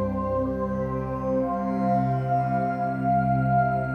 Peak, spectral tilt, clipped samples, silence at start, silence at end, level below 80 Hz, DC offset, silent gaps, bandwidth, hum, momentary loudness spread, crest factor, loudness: -12 dBFS; -10.5 dB/octave; under 0.1%; 0 s; 0 s; -44 dBFS; under 0.1%; none; 6 kHz; none; 5 LU; 12 dB; -25 LUFS